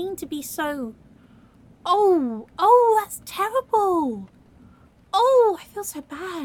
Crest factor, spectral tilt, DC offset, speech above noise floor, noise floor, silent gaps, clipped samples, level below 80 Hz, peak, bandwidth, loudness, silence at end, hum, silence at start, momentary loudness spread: 18 dB; -4 dB/octave; under 0.1%; 31 dB; -52 dBFS; none; under 0.1%; -60 dBFS; -4 dBFS; 17.5 kHz; -21 LUFS; 0 s; none; 0 s; 16 LU